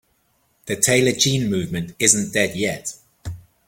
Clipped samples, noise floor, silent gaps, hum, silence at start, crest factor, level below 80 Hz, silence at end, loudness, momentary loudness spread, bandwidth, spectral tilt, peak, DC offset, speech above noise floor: under 0.1%; -65 dBFS; none; none; 0.65 s; 22 dB; -50 dBFS; 0.3 s; -19 LUFS; 20 LU; 17 kHz; -3 dB/octave; 0 dBFS; under 0.1%; 45 dB